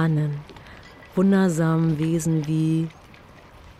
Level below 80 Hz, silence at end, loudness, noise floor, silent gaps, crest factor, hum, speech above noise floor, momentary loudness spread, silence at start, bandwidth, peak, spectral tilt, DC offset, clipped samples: -52 dBFS; 0.1 s; -22 LUFS; -47 dBFS; none; 14 dB; none; 26 dB; 14 LU; 0 s; 13 kHz; -10 dBFS; -7.5 dB/octave; under 0.1%; under 0.1%